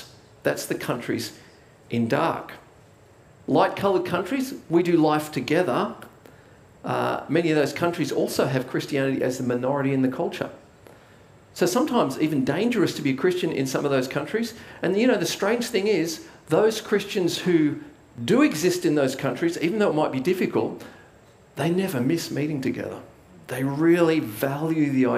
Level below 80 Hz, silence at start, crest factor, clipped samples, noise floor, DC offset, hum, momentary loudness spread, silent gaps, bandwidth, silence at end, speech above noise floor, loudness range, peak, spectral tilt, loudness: -64 dBFS; 0 s; 18 dB; under 0.1%; -52 dBFS; under 0.1%; none; 10 LU; none; 16 kHz; 0 s; 29 dB; 3 LU; -6 dBFS; -5.5 dB/octave; -24 LUFS